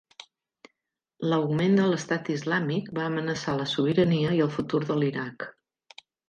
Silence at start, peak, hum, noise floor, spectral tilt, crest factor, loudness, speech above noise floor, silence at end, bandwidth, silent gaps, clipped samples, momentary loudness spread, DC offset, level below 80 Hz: 1.2 s; -10 dBFS; none; -81 dBFS; -6.5 dB/octave; 18 dB; -26 LUFS; 56 dB; 0.8 s; 9.4 kHz; none; under 0.1%; 9 LU; under 0.1%; -64 dBFS